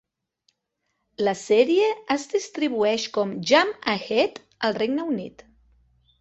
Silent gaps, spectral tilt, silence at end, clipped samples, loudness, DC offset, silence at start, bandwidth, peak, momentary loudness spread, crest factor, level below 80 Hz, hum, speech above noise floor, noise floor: none; -4 dB/octave; 0.9 s; under 0.1%; -23 LUFS; under 0.1%; 1.2 s; 8.2 kHz; -4 dBFS; 8 LU; 20 dB; -66 dBFS; none; 54 dB; -77 dBFS